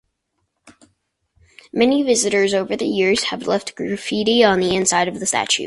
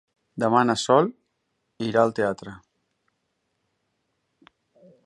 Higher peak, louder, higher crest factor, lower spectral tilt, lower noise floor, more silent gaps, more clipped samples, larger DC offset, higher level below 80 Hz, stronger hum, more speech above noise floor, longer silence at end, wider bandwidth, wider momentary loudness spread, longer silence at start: about the same, -2 dBFS vs -4 dBFS; first, -18 LUFS vs -22 LUFS; about the same, 18 dB vs 22 dB; second, -3 dB/octave vs -5 dB/octave; about the same, -72 dBFS vs -75 dBFS; neither; neither; neither; first, -56 dBFS vs -66 dBFS; neither; about the same, 55 dB vs 54 dB; second, 0 s vs 2.5 s; about the same, 11.5 kHz vs 11.5 kHz; second, 8 LU vs 16 LU; first, 1.75 s vs 0.35 s